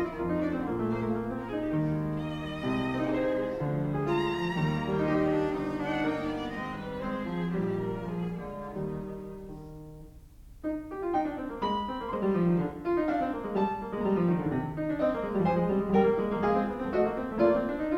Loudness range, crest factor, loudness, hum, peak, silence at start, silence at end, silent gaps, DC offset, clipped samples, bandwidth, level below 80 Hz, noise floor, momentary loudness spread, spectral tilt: 7 LU; 18 dB; -30 LUFS; none; -12 dBFS; 0 s; 0 s; none; under 0.1%; under 0.1%; 13.5 kHz; -50 dBFS; -50 dBFS; 9 LU; -8.5 dB/octave